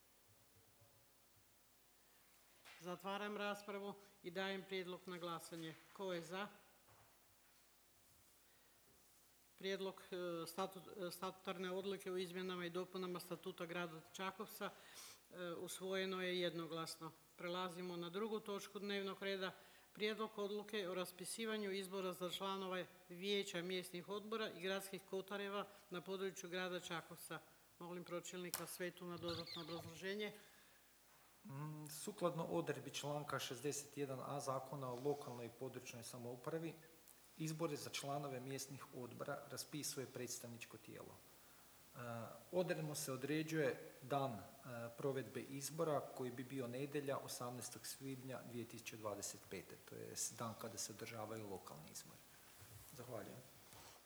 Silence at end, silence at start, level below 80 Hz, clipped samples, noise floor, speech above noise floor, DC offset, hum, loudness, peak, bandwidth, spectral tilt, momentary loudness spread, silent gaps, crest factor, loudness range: 0 s; 0 s; -84 dBFS; under 0.1%; -72 dBFS; 25 dB; under 0.1%; none; -48 LUFS; -22 dBFS; over 20 kHz; -4 dB/octave; 13 LU; none; 26 dB; 6 LU